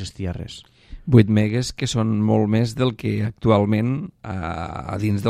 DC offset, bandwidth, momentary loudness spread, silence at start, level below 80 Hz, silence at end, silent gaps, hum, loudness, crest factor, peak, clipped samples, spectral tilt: under 0.1%; 12 kHz; 13 LU; 0 s; -44 dBFS; 0 s; none; none; -21 LUFS; 20 dB; 0 dBFS; under 0.1%; -7 dB/octave